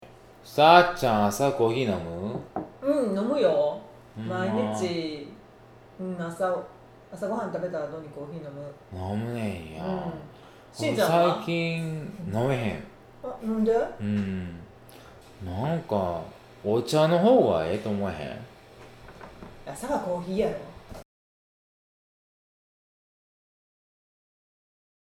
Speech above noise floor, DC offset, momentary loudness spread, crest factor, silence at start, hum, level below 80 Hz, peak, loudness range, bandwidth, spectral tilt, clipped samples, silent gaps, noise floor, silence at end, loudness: 25 dB; under 0.1%; 21 LU; 26 dB; 0 s; none; -56 dBFS; -2 dBFS; 9 LU; 17 kHz; -6 dB/octave; under 0.1%; none; -51 dBFS; 4.05 s; -26 LUFS